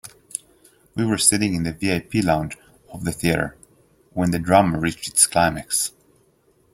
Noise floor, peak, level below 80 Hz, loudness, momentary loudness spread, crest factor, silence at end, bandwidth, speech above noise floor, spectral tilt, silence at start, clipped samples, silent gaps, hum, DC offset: -60 dBFS; 0 dBFS; -48 dBFS; -20 LUFS; 16 LU; 22 dB; 0.85 s; 16.5 kHz; 40 dB; -4 dB/octave; 0.05 s; under 0.1%; none; none; under 0.1%